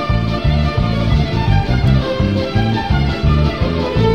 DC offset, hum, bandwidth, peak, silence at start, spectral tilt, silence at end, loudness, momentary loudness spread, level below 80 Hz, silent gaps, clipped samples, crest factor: 1%; none; 9.4 kHz; -2 dBFS; 0 s; -8 dB/octave; 0 s; -16 LUFS; 2 LU; -20 dBFS; none; under 0.1%; 12 dB